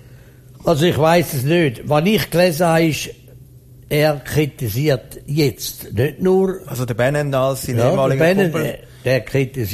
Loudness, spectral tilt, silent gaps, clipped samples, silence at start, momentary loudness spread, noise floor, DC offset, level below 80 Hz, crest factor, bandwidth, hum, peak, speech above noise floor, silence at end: -18 LUFS; -6 dB/octave; none; under 0.1%; 0.1 s; 9 LU; -42 dBFS; under 0.1%; -44 dBFS; 16 dB; 15.5 kHz; none; -2 dBFS; 26 dB; 0 s